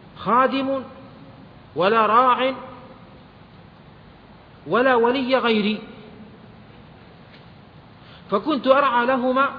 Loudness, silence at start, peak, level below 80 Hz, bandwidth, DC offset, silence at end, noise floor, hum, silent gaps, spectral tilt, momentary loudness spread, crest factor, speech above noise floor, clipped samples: -19 LUFS; 0.2 s; -2 dBFS; -58 dBFS; 5.2 kHz; under 0.1%; 0 s; -46 dBFS; none; none; -8 dB/octave; 23 LU; 20 dB; 28 dB; under 0.1%